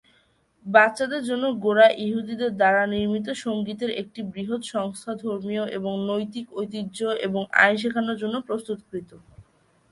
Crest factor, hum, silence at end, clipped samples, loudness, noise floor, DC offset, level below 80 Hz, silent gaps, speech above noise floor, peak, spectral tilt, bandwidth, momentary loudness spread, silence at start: 22 dB; none; 0.5 s; under 0.1%; -24 LUFS; -63 dBFS; under 0.1%; -64 dBFS; none; 40 dB; -2 dBFS; -5 dB/octave; 11.5 kHz; 14 LU; 0.65 s